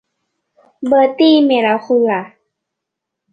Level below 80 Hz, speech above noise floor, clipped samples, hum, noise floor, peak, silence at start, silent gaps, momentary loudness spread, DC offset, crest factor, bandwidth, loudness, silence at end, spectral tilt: -64 dBFS; 67 dB; under 0.1%; none; -80 dBFS; -2 dBFS; 0.8 s; none; 9 LU; under 0.1%; 14 dB; 6 kHz; -13 LUFS; 1.05 s; -6.5 dB/octave